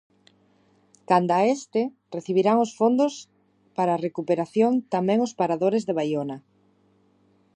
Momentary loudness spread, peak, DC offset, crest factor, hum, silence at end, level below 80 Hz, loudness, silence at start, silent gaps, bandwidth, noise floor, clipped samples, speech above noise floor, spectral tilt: 9 LU; -6 dBFS; under 0.1%; 18 dB; none; 1.15 s; -76 dBFS; -24 LUFS; 1.1 s; none; 9.8 kHz; -63 dBFS; under 0.1%; 40 dB; -6.5 dB/octave